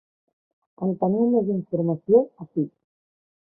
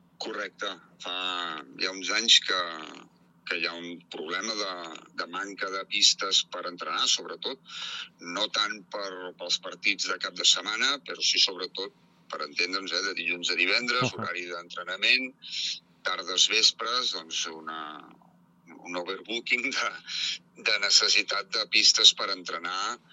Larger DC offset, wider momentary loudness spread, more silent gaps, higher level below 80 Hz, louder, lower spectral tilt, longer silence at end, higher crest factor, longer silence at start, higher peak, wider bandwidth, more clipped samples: neither; second, 10 LU vs 17 LU; neither; first, -68 dBFS vs -84 dBFS; about the same, -23 LUFS vs -25 LUFS; first, -16 dB/octave vs 0 dB/octave; first, 0.75 s vs 0.15 s; second, 18 dB vs 26 dB; first, 0.8 s vs 0.2 s; second, -6 dBFS vs -2 dBFS; second, 1.4 kHz vs 13.5 kHz; neither